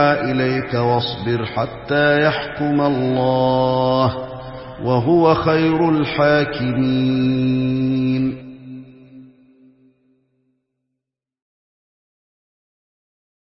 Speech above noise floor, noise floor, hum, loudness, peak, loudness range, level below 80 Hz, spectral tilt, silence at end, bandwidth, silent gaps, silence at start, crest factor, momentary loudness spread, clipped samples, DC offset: 65 dB; -82 dBFS; none; -18 LUFS; 0 dBFS; 7 LU; -48 dBFS; -11 dB/octave; 4.35 s; 5.8 kHz; none; 0 s; 18 dB; 12 LU; under 0.1%; under 0.1%